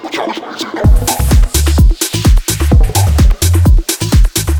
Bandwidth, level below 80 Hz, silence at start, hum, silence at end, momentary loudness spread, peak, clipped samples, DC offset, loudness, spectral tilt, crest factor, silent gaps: 19.5 kHz; -12 dBFS; 0 s; none; 0 s; 8 LU; 0 dBFS; under 0.1%; under 0.1%; -12 LUFS; -4.5 dB/octave; 10 dB; none